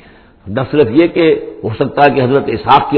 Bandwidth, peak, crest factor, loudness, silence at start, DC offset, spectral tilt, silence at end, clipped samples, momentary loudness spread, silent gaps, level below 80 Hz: 5.4 kHz; 0 dBFS; 12 dB; -12 LUFS; 0.45 s; under 0.1%; -9.5 dB/octave; 0 s; 0.3%; 9 LU; none; -42 dBFS